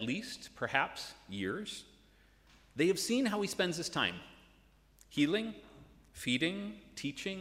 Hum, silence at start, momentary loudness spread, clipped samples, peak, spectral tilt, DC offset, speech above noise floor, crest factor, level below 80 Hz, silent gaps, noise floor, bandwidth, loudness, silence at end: none; 0 s; 14 LU; under 0.1%; -12 dBFS; -4 dB/octave; under 0.1%; 29 dB; 24 dB; -66 dBFS; none; -65 dBFS; 16 kHz; -35 LUFS; 0 s